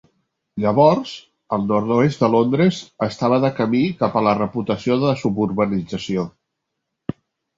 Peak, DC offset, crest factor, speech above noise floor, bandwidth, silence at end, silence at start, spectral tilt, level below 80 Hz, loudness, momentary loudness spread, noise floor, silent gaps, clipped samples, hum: -2 dBFS; under 0.1%; 18 dB; 60 dB; 7.8 kHz; 1.3 s; 0.55 s; -7.5 dB/octave; -54 dBFS; -19 LUFS; 16 LU; -78 dBFS; none; under 0.1%; none